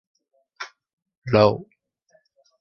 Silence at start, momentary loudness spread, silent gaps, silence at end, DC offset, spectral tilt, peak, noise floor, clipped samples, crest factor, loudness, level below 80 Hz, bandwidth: 0.6 s; 20 LU; 0.93-0.97 s, 1.17-1.22 s; 0.95 s; under 0.1%; -7.5 dB/octave; -2 dBFS; -64 dBFS; under 0.1%; 24 dB; -20 LUFS; -56 dBFS; 6.6 kHz